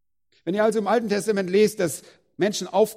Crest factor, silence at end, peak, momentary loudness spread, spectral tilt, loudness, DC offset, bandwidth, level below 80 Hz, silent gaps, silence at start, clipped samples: 16 dB; 0 s; -8 dBFS; 8 LU; -4.5 dB/octave; -23 LUFS; under 0.1%; 16 kHz; -66 dBFS; none; 0.45 s; under 0.1%